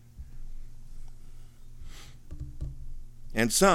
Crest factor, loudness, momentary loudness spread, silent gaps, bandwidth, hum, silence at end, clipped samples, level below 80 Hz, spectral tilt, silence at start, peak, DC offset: 24 dB; -30 LUFS; 25 LU; none; 16.5 kHz; none; 0 s; under 0.1%; -40 dBFS; -3.5 dB/octave; 0 s; -6 dBFS; under 0.1%